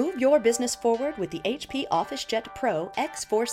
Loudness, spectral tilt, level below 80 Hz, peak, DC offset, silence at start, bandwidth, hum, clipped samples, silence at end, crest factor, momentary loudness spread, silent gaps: -26 LUFS; -3.5 dB/octave; -60 dBFS; -10 dBFS; under 0.1%; 0 s; 16 kHz; none; under 0.1%; 0 s; 16 dB; 8 LU; none